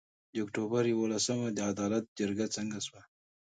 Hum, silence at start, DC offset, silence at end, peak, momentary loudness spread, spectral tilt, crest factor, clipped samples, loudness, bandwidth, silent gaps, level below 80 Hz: none; 0.35 s; under 0.1%; 0.4 s; -16 dBFS; 9 LU; -4.5 dB/octave; 16 dB; under 0.1%; -33 LUFS; 9.4 kHz; 2.08-2.16 s; -70 dBFS